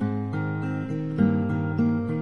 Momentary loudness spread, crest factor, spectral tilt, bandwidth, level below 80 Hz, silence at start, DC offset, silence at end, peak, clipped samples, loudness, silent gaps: 6 LU; 16 dB; -10 dB/octave; 6.4 kHz; -64 dBFS; 0 s; 0.3%; 0 s; -10 dBFS; under 0.1%; -26 LUFS; none